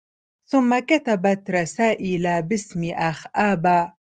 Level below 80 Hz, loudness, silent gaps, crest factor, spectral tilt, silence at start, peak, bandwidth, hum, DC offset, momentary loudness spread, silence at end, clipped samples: -58 dBFS; -21 LUFS; none; 18 dB; -6 dB/octave; 0.5 s; -4 dBFS; 9.6 kHz; none; under 0.1%; 6 LU; 0.2 s; under 0.1%